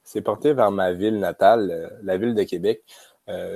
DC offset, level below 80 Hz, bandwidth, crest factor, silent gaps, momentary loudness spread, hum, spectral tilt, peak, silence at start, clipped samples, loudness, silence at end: under 0.1%; -64 dBFS; 14.5 kHz; 18 dB; none; 14 LU; none; -6.5 dB/octave; -4 dBFS; 0.05 s; under 0.1%; -21 LUFS; 0 s